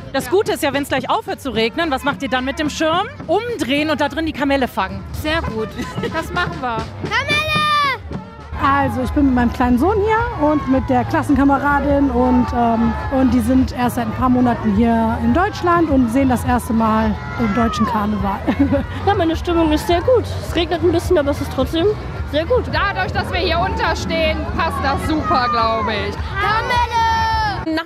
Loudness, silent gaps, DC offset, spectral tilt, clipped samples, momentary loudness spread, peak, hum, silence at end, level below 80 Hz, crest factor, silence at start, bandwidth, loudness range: -17 LUFS; none; under 0.1%; -6 dB/octave; under 0.1%; 6 LU; -4 dBFS; none; 0 s; -32 dBFS; 14 dB; 0 s; 15.5 kHz; 3 LU